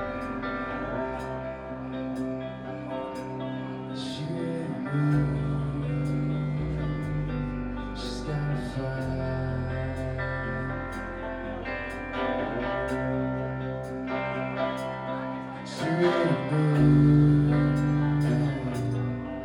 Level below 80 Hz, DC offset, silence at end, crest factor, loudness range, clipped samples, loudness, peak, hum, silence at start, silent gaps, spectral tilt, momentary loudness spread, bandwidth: -42 dBFS; under 0.1%; 0 s; 18 dB; 10 LU; under 0.1%; -29 LUFS; -10 dBFS; none; 0 s; none; -8 dB/octave; 11 LU; 10.5 kHz